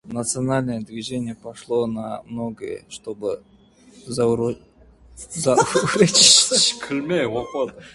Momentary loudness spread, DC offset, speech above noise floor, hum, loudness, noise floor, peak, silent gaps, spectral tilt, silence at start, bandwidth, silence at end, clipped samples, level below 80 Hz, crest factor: 21 LU; under 0.1%; 29 dB; none; -19 LUFS; -50 dBFS; 0 dBFS; none; -2.5 dB/octave; 0.05 s; 11.5 kHz; 0.05 s; under 0.1%; -54 dBFS; 22 dB